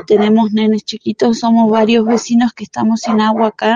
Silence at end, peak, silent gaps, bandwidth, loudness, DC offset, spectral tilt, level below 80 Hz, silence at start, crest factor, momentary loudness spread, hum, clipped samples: 0 s; 0 dBFS; none; 7.6 kHz; -13 LUFS; under 0.1%; -5.5 dB/octave; -58 dBFS; 0.1 s; 12 dB; 7 LU; none; under 0.1%